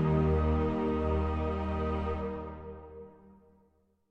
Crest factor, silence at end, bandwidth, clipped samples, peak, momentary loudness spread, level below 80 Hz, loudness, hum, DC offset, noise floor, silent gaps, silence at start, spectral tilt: 16 dB; 1 s; 5.2 kHz; under 0.1%; -16 dBFS; 20 LU; -38 dBFS; -31 LUFS; none; under 0.1%; -69 dBFS; none; 0 s; -9.5 dB/octave